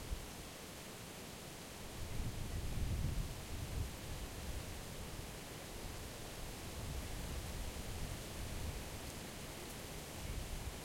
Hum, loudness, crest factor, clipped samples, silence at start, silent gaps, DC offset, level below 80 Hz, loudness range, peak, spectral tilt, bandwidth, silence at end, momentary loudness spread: none; -46 LUFS; 18 dB; under 0.1%; 0 s; none; under 0.1%; -48 dBFS; 2 LU; -28 dBFS; -4 dB/octave; 16.5 kHz; 0 s; 6 LU